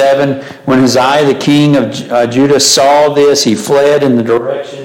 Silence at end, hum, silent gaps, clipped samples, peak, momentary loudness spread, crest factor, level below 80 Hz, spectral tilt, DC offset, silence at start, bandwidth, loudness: 0 s; none; none; under 0.1%; 0 dBFS; 7 LU; 8 dB; -50 dBFS; -4 dB/octave; under 0.1%; 0 s; 17 kHz; -9 LUFS